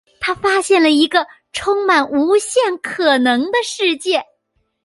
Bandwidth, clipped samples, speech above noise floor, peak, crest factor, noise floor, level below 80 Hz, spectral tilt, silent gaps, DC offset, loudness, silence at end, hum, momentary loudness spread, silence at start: 11.5 kHz; under 0.1%; 52 dB; 0 dBFS; 16 dB; -67 dBFS; -54 dBFS; -2 dB/octave; none; under 0.1%; -16 LUFS; 0.6 s; none; 7 LU; 0.2 s